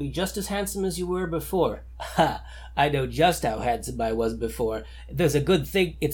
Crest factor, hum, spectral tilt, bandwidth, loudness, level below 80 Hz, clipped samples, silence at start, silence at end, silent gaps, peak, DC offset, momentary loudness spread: 18 dB; none; -5 dB/octave; 19 kHz; -26 LUFS; -40 dBFS; under 0.1%; 0 s; 0 s; none; -8 dBFS; under 0.1%; 8 LU